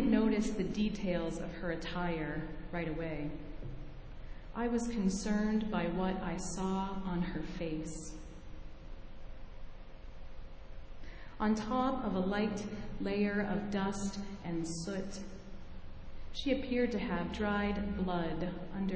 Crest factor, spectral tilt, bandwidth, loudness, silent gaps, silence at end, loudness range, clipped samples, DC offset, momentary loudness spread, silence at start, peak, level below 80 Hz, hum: 18 dB; -6 dB/octave; 8 kHz; -36 LUFS; none; 0 s; 8 LU; under 0.1%; under 0.1%; 20 LU; 0 s; -18 dBFS; -48 dBFS; none